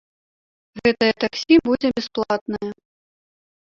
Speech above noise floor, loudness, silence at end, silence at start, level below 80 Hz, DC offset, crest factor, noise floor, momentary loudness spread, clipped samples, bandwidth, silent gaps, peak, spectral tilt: over 70 dB; -20 LUFS; 0.95 s; 0.75 s; -56 dBFS; under 0.1%; 18 dB; under -90 dBFS; 12 LU; under 0.1%; 7.2 kHz; 2.41-2.46 s; -4 dBFS; -5 dB/octave